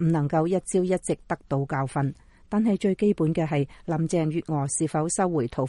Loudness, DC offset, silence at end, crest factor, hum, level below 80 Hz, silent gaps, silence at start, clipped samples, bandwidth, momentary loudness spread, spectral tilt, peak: -26 LUFS; under 0.1%; 0 s; 14 dB; none; -52 dBFS; none; 0 s; under 0.1%; 11.5 kHz; 6 LU; -6.5 dB/octave; -10 dBFS